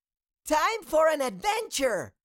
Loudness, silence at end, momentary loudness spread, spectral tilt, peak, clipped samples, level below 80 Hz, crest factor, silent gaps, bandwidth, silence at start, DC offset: -26 LUFS; 0.15 s; 5 LU; -2.5 dB/octave; -14 dBFS; under 0.1%; -58 dBFS; 14 dB; none; 17 kHz; 0.45 s; under 0.1%